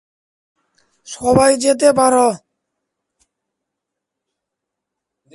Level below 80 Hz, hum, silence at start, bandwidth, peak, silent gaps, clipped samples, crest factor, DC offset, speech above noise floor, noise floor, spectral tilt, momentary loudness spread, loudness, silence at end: -50 dBFS; none; 1.1 s; 11.5 kHz; 0 dBFS; none; under 0.1%; 18 dB; under 0.1%; 68 dB; -81 dBFS; -4 dB/octave; 15 LU; -14 LUFS; 3 s